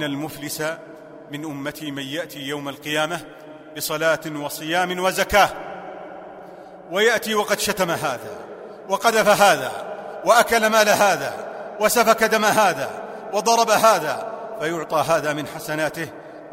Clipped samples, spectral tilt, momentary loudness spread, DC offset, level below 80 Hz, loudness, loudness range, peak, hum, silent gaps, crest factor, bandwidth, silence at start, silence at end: under 0.1%; -3 dB/octave; 20 LU; under 0.1%; -54 dBFS; -20 LUFS; 8 LU; 0 dBFS; none; none; 22 dB; 16 kHz; 0 s; 0 s